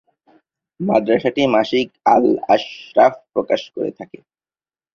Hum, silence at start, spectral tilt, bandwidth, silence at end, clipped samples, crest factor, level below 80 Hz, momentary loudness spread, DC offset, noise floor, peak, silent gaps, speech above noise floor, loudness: none; 0.8 s; -6 dB/octave; 7 kHz; 0.9 s; under 0.1%; 16 dB; -60 dBFS; 11 LU; under 0.1%; under -90 dBFS; -2 dBFS; none; over 73 dB; -17 LUFS